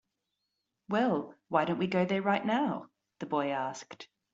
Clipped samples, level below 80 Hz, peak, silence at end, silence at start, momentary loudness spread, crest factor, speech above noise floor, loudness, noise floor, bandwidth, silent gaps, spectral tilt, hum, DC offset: under 0.1%; -76 dBFS; -12 dBFS; 0.3 s; 0.9 s; 15 LU; 20 dB; 53 dB; -31 LUFS; -84 dBFS; 7.8 kHz; none; -4.5 dB/octave; 50 Hz at -55 dBFS; under 0.1%